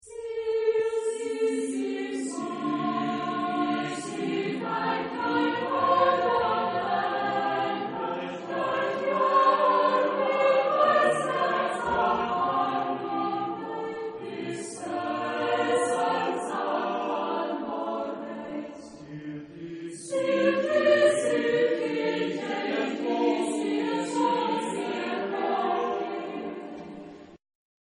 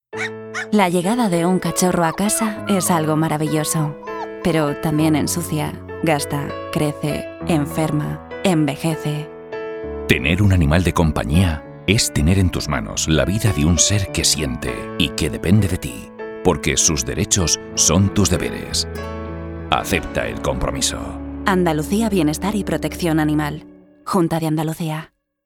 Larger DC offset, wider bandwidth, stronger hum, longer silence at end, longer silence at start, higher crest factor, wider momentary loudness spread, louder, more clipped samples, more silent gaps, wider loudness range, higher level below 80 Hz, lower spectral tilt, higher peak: neither; second, 10.5 kHz vs 18.5 kHz; neither; first, 0.55 s vs 0.4 s; about the same, 0.05 s vs 0.15 s; about the same, 18 dB vs 20 dB; about the same, 13 LU vs 11 LU; second, -27 LUFS vs -19 LUFS; neither; neither; first, 7 LU vs 4 LU; second, -66 dBFS vs -34 dBFS; about the same, -4.5 dB/octave vs -4.5 dB/octave; second, -10 dBFS vs 0 dBFS